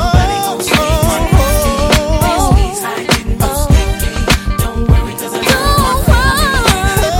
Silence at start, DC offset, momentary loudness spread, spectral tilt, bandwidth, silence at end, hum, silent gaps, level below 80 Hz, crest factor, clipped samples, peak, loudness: 0 s; under 0.1%; 5 LU; -4.5 dB/octave; 17 kHz; 0 s; none; none; -16 dBFS; 12 dB; under 0.1%; 0 dBFS; -12 LUFS